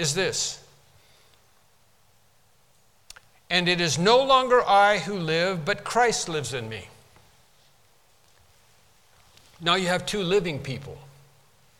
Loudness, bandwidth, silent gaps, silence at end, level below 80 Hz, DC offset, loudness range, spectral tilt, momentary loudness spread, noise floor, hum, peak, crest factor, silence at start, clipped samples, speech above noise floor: -23 LUFS; 16.5 kHz; none; 0.75 s; -56 dBFS; under 0.1%; 13 LU; -3.5 dB/octave; 15 LU; -63 dBFS; none; -6 dBFS; 20 dB; 0 s; under 0.1%; 40 dB